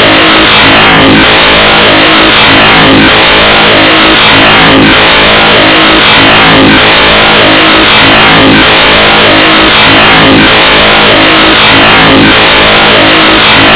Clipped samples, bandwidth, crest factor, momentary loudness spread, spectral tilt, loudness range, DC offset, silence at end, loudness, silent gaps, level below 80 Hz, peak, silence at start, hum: 30%; 4 kHz; 2 dB; 1 LU; -8 dB/octave; 0 LU; under 0.1%; 0 s; 0 LUFS; none; -24 dBFS; 0 dBFS; 0 s; none